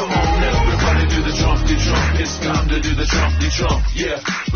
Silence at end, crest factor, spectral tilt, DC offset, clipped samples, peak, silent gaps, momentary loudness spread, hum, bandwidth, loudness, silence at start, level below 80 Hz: 0 s; 12 dB; -5 dB/octave; under 0.1%; under 0.1%; -4 dBFS; none; 3 LU; none; 6.8 kHz; -18 LUFS; 0 s; -20 dBFS